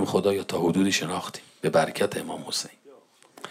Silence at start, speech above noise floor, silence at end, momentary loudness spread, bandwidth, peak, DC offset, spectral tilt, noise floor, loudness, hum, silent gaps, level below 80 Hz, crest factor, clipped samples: 0 s; 28 dB; 0 s; 11 LU; 16 kHz; -8 dBFS; under 0.1%; -4.5 dB/octave; -54 dBFS; -26 LUFS; none; none; -70 dBFS; 18 dB; under 0.1%